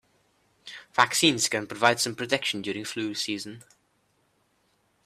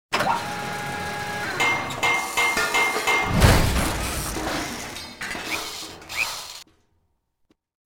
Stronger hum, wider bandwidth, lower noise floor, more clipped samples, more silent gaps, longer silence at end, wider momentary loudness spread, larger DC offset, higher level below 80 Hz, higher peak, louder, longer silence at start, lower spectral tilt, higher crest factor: neither; second, 15.5 kHz vs over 20 kHz; about the same, -70 dBFS vs -70 dBFS; neither; neither; first, 1.45 s vs 1.25 s; about the same, 14 LU vs 14 LU; neither; second, -70 dBFS vs -34 dBFS; about the same, -4 dBFS vs -4 dBFS; about the same, -25 LUFS vs -23 LUFS; first, 0.65 s vs 0.1 s; about the same, -2.5 dB/octave vs -3.5 dB/octave; first, 26 dB vs 20 dB